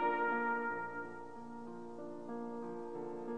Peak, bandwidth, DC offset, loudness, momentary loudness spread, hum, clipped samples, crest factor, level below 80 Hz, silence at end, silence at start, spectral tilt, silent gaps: -24 dBFS; 9.8 kHz; 0.2%; -41 LUFS; 14 LU; none; under 0.1%; 16 dB; -84 dBFS; 0 s; 0 s; -7 dB/octave; none